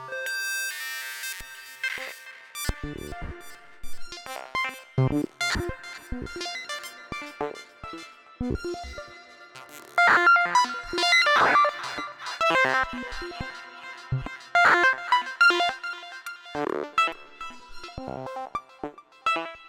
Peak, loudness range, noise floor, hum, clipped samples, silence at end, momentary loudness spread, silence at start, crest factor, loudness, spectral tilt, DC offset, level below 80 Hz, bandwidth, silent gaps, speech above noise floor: -10 dBFS; 13 LU; -47 dBFS; none; under 0.1%; 0 s; 22 LU; 0 s; 18 dB; -25 LUFS; -3.5 dB/octave; under 0.1%; -48 dBFS; 18 kHz; none; 18 dB